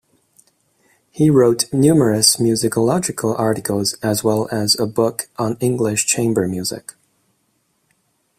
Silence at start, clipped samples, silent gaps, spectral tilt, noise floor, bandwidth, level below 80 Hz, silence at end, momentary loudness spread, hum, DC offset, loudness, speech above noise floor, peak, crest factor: 1.15 s; under 0.1%; none; -4.5 dB/octave; -66 dBFS; 16 kHz; -54 dBFS; 1.6 s; 9 LU; none; under 0.1%; -17 LUFS; 49 dB; 0 dBFS; 18 dB